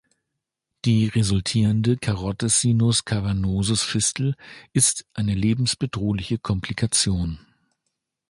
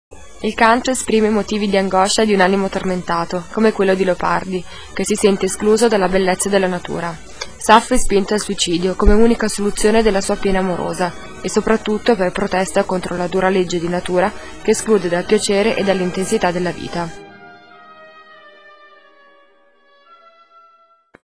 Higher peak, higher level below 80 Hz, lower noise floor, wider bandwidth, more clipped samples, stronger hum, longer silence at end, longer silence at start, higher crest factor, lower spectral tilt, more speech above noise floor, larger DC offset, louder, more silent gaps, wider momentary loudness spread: second, -4 dBFS vs 0 dBFS; second, -42 dBFS vs -32 dBFS; first, -82 dBFS vs -54 dBFS; about the same, 11.5 kHz vs 11 kHz; neither; neither; first, 0.95 s vs 0.05 s; first, 0.85 s vs 0.1 s; about the same, 20 dB vs 18 dB; about the same, -4.5 dB/octave vs -4.5 dB/octave; first, 60 dB vs 38 dB; second, under 0.1% vs 2%; second, -22 LUFS vs -17 LUFS; neither; about the same, 8 LU vs 10 LU